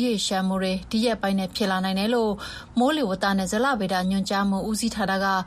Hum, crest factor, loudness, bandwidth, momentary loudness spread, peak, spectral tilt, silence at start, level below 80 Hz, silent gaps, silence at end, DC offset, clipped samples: none; 12 dB; -24 LUFS; 14.5 kHz; 3 LU; -10 dBFS; -4.5 dB/octave; 0 s; -50 dBFS; none; 0 s; under 0.1%; under 0.1%